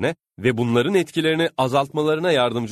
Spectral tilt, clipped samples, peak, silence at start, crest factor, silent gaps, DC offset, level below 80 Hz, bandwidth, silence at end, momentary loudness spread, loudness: -6 dB/octave; under 0.1%; -6 dBFS; 0 s; 16 dB; none; under 0.1%; -58 dBFS; 13.5 kHz; 0 s; 4 LU; -20 LUFS